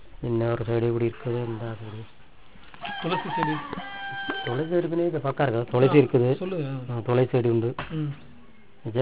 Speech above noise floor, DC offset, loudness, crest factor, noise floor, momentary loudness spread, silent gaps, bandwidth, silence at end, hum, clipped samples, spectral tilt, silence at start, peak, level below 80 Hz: 28 dB; 0.6%; -26 LUFS; 20 dB; -53 dBFS; 13 LU; none; 4 kHz; 0 s; none; under 0.1%; -11.5 dB/octave; 0.1 s; -6 dBFS; -54 dBFS